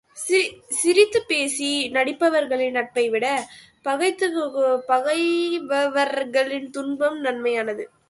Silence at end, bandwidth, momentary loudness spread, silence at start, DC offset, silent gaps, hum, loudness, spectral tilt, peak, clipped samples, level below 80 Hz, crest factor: 0.25 s; 12 kHz; 7 LU; 0.15 s; under 0.1%; none; none; -22 LUFS; -1.5 dB/octave; -4 dBFS; under 0.1%; -68 dBFS; 18 dB